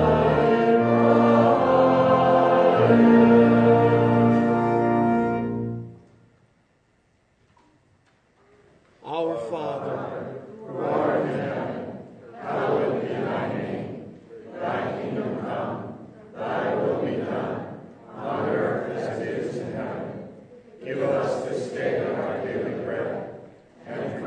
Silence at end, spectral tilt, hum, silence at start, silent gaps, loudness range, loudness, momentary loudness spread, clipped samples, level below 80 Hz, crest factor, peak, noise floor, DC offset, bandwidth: 0 s; -8.5 dB/octave; none; 0 s; none; 15 LU; -22 LUFS; 20 LU; under 0.1%; -54 dBFS; 18 dB; -6 dBFS; -64 dBFS; under 0.1%; 8.8 kHz